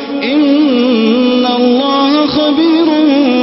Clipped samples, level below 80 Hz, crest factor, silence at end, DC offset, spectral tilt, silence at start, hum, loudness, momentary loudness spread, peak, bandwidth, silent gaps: under 0.1%; -50 dBFS; 10 dB; 0 s; under 0.1%; -8 dB/octave; 0 s; none; -10 LUFS; 1 LU; 0 dBFS; 5.8 kHz; none